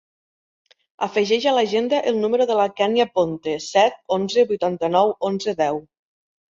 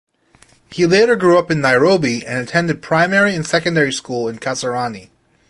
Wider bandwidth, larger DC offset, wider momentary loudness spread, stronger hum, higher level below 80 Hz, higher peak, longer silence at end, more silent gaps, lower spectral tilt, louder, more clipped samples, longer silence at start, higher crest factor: second, 7.8 kHz vs 11.5 kHz; neither; second, 5 LU vs 10 LU; neither; second, -64 dBFS vs -54 dBFS; about the same, -4 dBFS vs -2 dBFS; first, 0.7 s vs 0.45 s; neither; about the same, -4.5 dB/octave vs -5 dB/octave; second, -20 LUFS vs -15 LUFS; neither; first, 1 s vs 0.7 s; about the same, 18 dB vs 16 dB